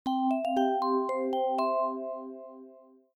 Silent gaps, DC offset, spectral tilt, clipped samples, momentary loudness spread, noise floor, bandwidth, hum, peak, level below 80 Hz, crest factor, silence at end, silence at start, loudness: none; under 0.1%; -5 dB/octave; under 0.1%; 15 LU; -55 dBFS; 12.5 kHz; none; -16 dBFS; -80 dBFS; 14 dB; 0.35 s; 0.05 s; -29 LUFS